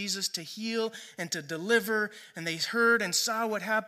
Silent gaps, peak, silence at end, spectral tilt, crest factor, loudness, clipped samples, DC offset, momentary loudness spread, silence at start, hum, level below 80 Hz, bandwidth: none; -12 dBFS; 0 s; -2 dB/octave; 18 dB; -29 LUFS; under 0.1%; under 0.1%; 11 LU; 0 s; none; -84 dBFS; 15.5 kHz